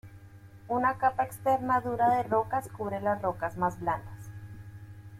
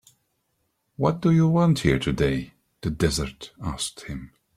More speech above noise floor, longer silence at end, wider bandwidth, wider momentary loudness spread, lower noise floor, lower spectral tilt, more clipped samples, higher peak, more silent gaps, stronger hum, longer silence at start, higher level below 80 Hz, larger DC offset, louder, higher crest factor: second, 22 dB vs 51 dB; second, 0 s vs 0.3 s; first, 15.5 kHz vs 14 kHz; first, 19 LU vs 16 LU; second, -50 dBFS vs -73 dBFS; about the same, -7 dB/octave vs -6 dB/octave; neither; second, -14 dBFS vs -4 dBFS; neither; neither; second, 0.05 s vs 1 s; second, -58 dBFS vs -42 dBFS; neither; second, -29 LUFS vs -24 LUFS; about the same, 18 dB vs 20 dB